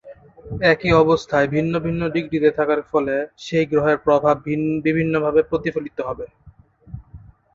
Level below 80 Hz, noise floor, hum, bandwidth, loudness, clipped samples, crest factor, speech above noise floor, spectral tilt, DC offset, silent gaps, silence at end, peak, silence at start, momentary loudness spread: -46 dBFS; -48 dBFS; none; 7.4 kHz; -19 LUFS; under 0.1%; 18 dB; 29 dB; -7 dB/octave; under 0.1%; none; 0.35 s; -2 dBFS; 0.05 s; 15 LU